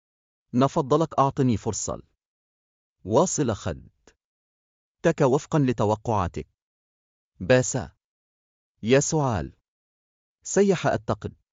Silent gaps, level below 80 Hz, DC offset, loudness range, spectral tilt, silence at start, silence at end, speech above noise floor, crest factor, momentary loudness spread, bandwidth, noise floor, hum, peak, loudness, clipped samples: 2.26-2.96 s, 4.24-4.95 s, 6.62-7.31 s, 8.05-8.75 s, 9.68-10.38 s; -52 dBFS; under 0.1%; 3 LU; -5.5 dB/octave; 0.55 s; 0.2 s; over 67 dB; 20 dB; 16 LU; 9.4 kHz; under -90 dBFS; none; -6 dBFS; -24 LUFS; under 0.1%